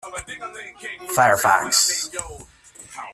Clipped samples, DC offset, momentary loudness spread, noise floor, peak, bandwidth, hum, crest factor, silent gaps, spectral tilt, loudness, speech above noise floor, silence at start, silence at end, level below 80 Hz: under 0.1%; under 0.1%; 20 LU; -41 dBFS; -2 dBFS; 15.5 kHz; none; 20 dB; none; -1 dB/octave; -18 LUFS; 20 dB; 0.05 s; 0 s; -52 dBFS